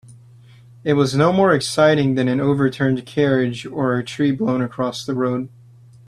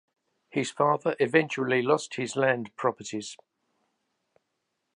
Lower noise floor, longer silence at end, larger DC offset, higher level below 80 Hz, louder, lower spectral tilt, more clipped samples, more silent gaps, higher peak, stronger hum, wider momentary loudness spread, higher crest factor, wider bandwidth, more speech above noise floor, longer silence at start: second, -46 dBFS vs -80 dBFS; second, 0.6 s vs 1.6 s; neither; first, -54 dBFS vs -78 dBFS; first, -19 LUFS vs -27 LUFS; first, -6.5 dB/octave vs -5 dB/octave; neither; neither; first, -2 dBFS vs -6 dBFS; neither; second, 8 LU vs 12 LU; second, 16 dB vs 22 dB; first, 13 kHz vs 11 kHz; second, 28 dB vs 53 dB; second, 0.1 s vs 0.55 s